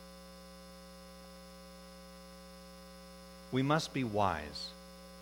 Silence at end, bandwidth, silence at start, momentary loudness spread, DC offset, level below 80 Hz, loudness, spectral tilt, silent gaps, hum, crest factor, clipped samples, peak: 0 s; 19.5 kHz; 0 s; 20 LU; under 0.1%; -60 dBFS; -35 LUFS; -5.5 dB/octave; none; none; 24 dB; under 0.1%; -16 dBFS